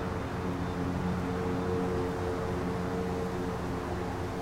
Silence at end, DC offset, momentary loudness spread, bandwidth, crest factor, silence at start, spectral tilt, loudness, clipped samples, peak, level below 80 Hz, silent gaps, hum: 0 s; under 0.1%; 3 LU; 16 kHz; 12 dB; 0 s; -7 dB/octave; -33 LUFS; under 0.1%; -20 dBFS; -46 dBFS; none; none